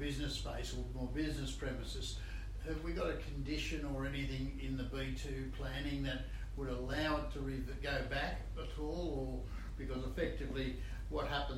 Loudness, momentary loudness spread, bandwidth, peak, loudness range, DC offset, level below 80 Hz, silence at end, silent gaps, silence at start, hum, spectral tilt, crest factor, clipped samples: -42 LUFS; 6 LU; 14 kHz; -24 dBFS; 1 LU; under 0.1%; -44 dBFS; 0 s; none; 0 s; none; -5.5 dB/octave; 16 dB; under 0.1%